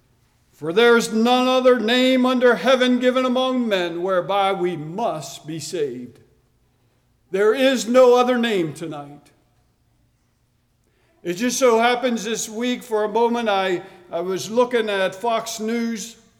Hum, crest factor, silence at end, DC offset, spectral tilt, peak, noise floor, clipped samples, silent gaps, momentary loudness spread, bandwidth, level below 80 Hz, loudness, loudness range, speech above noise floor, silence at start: none; 14 dB; 0.3 s; under 0.1%; -4 dB/octave; -6 dBFS; -64 dBFS; under 0.1%; none; 13 LU; 16 kHz; -66 dBFS; -19 LUFS; 8 LU; 45 dB; 0.6 s